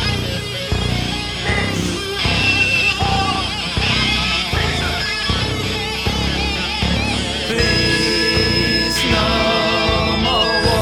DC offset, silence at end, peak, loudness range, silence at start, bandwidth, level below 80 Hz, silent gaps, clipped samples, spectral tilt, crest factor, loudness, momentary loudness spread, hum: under 0.1%; 0 s; -2 dBFS; 3 LU; 0 s; 18.5 kHz; -28 dBFS; none; under 0.1%; -4 dB/octave; 16 dB; -16 LUFS; 6 LU; none